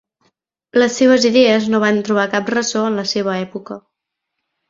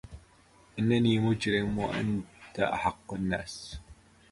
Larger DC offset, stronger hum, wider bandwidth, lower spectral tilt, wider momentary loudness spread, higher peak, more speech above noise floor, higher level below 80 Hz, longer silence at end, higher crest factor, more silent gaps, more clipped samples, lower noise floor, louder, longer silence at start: neither; neither; second, 7.8 kHz vs 11.5 kHz; second, -4 dB/octave vs -6 dB/octave; second, 15 LU vs 18 LU; first, -2 dBFS vs -12 dBFS; first, 63 dB vs 31 dB; second, -60 dBFS vs -52 dBFS; first, 0.9 s vs 0.4 s; about the same, 16 dB vs 18 dB; neither; neither; first, -78 dBFS vs -60 dBFS; first, -15 LUFS vs -30 LUFS; first, 0.75 s vs 0.05 s